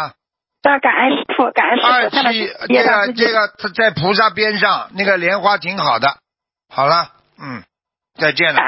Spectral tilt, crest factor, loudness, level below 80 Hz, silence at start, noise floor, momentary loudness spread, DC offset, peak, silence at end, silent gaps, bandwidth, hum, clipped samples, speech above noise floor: -8 dB/octave; 16 dB; -14 LUFS; -60 dBFS; 0 s; -73 dBFS; 15 LU; under 0.1%; 0 dBFS; 0 s; none; 5.8 kHz; none; under 0.1%; 58 dB